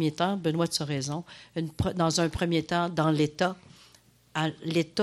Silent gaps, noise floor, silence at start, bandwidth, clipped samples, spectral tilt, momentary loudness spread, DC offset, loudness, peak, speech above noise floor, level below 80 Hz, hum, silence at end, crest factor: none; -59 dBFS; 0 s; 13.5 kHz; under 0.1%; -5 dB/octave; 10 LU; under 0.1%; -28 LUFS; -12 dBFS; 32 dB; -52 dBFS; none; 0 s; 16 dB